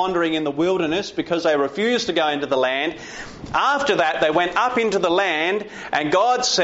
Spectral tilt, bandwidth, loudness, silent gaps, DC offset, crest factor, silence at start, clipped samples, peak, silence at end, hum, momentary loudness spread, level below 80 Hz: -2 dB/octave; 8 kHz; -20 LUFS; none; under 0.1%; 14 dB; 0 s; under 0.1%; -6 dBFS; 0 s; none; 7 LU; -54 dBFS